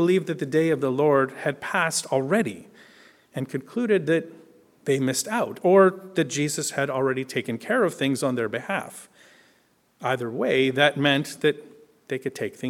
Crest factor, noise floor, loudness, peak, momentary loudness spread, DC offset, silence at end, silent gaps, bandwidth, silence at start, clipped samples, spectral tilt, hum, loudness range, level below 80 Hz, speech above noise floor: 20 dB; -63 dBFS; -24 LUFS; -4 dBFS; 12 LU; under 0.1%; 0 s; none; 16.5 kHz; 0 s; under 0.1%; -4.5 dB/octave; none; 4 LU; -72 dBFS; 40 dB